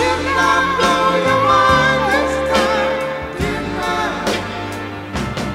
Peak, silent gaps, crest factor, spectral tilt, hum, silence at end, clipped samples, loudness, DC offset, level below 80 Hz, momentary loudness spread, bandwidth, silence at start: -2 dBFS; none; 16 dB; -4.5 dB/octave; none; 0 s; under 0.1%; -16 LUFS; under 0.1%; -36 dBFS; 12 LU; 16 kHz; 0 s